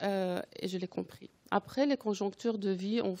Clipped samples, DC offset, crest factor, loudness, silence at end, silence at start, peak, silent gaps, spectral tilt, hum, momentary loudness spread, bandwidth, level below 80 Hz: under 0.1%; under 0.1%; 20 dB; -34 LUFS; 0 s; 0 s; -14 dBFS; none; -6 dB/octave; none; 9 LU; 16 kHz; -76 dBFS